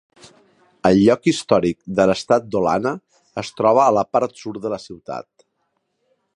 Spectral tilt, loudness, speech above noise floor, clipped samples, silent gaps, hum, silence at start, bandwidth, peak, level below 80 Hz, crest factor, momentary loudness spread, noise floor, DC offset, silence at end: -6 dB/octave; -18 LUFS; 53 dB; under 0.1%; none; none; 0.85 s; 11 kHz; -2 dBFS; -52 dBFS; 18 dB; 17 LU; -71 dBFS; under 0.1%; 1.15 s